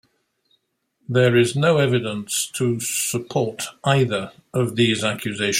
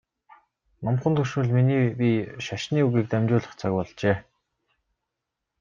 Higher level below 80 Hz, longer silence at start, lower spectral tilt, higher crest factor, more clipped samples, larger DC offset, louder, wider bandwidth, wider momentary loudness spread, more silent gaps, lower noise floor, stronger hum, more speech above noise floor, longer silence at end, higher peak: about the same, -60 dBFS vs -60 dBFS; first, 1.1 s vs 0.8 s; second, -4.5 dB/octave vs -7.5 dB/octave; about the same, 18 dB vs 18 dB; neither; neither; first, -21 LUFS vs -25 LUFS; first, 16.5 kHz vs 7.4 kHz; about the same, 7 LU vs 7 LU; neither; second, -70 dBFS vs -84 dBFS; neither; second, 49 dB vs 60 dB; second, 0 s vs 1.4 s; first, -2 dBFS vs -8 dBFS